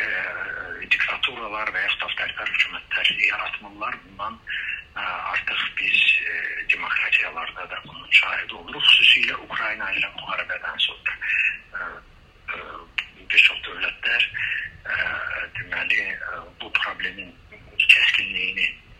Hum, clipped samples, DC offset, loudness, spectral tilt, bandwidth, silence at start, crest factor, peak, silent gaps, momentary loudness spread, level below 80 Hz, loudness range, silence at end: none; under 0.1%; under 0.1%; -21 LUFS; -1 dB/octave; 14.5 kHz; 0 s; 24 dB; 0 dBFS; none; 17 LU; -54 dBFS; 6 LU; 0.05 s